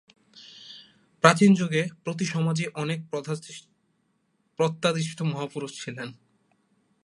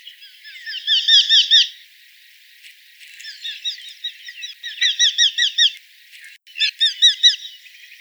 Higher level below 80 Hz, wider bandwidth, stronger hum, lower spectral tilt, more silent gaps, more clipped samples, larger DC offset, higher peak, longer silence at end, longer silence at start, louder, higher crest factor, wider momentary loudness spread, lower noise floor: first, -72 dBFS vs under -90 dBFS; second, 11.5 kHz vs over 20 kHz; neither; first, -5.5 dB/octave vs 12 dB/octave; neither; neither; neither; about the same, 0 dBFS vs 0 dBFS; first, 0.9 s vs 0.45 s; about the same, 0.35 s vs 0.25 s; second, -25 LUFS vs -14 LUFS; first, 26 dB vs 20 dB; about the same, 24 LU vs 22 LU; first, -71 dBFS vs -48 dBFS